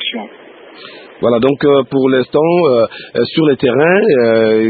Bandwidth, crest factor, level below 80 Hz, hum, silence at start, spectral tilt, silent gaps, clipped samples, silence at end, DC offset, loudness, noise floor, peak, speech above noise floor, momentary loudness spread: 4.8 kHz; 12 dB; -54 dBFS; none; 0 s; -10 dB/octave; none; under 0.1%; 0 s; under 0.1%; -12 LUFS; -37 dBFS; 0 dBFS; 26 dB; 11 LU